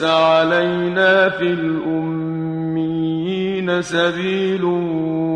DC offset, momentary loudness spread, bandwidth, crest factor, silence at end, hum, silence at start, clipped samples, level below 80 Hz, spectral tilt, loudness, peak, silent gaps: under 0.1%; 8 LU; 10 kHz; 16 dB; 0 s; none; 0 s; under 0.1%; -56 dBFS; -6 dB/octave; -18 LUFS; -2 dBFS; none